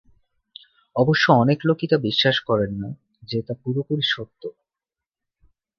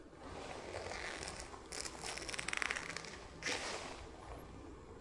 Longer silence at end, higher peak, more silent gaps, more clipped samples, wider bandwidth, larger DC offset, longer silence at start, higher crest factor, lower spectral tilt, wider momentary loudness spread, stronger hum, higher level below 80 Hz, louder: first, 1.3 s vs 0 s; first, -2 dBFS vs -14 dBFS; neither; neither; second, 7 kHz vs 12 kHz; neither; first, 0.95 s vs 0 s; second, 22 dB vs 32 dB; first, -6.5 dB/octave vs -2 dB/octave; first, 18 LU vs 13 LU; neither; about the same, -56 dBFS vs -60 dBFS; first, -21 LUFS vs -44 LUFS